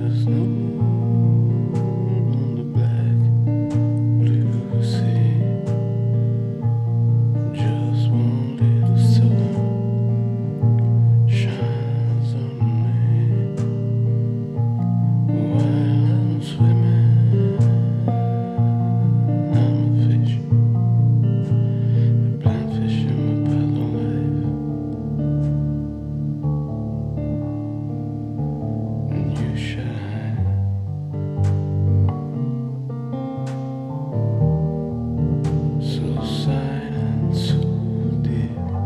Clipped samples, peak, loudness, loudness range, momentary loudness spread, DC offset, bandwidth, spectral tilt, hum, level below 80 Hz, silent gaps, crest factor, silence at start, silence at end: under 0.1%; -4 dBFS; -20 LUFS; 6 LU; 9 LU; under 0.1%; 5.6 kHz; -9.5 dB/octave; none; -42 dBFS; none; 14 dB; 0 s; 0 s